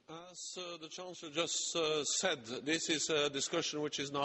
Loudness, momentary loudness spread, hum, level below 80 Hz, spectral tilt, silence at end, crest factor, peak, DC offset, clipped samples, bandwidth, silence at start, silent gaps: -35 LUFS; 13 LU; none; -78 dBFS; -2 dB/octave; 0 s; 18 dB; -20 dBFS; under 0.1%; under 0.1%; 8.4 kHz; 0.1 s; none